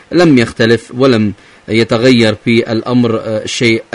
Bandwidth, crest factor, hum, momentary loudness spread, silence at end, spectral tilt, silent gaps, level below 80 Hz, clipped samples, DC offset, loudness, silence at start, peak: 11 kHz; 12 dB; none; 8 LU; 0.1 s; -5.5 dB/octave; none; -44 dBFS; 0.2%; under 0.1%; -11 LUFS; 0.1 s; 0 dBFS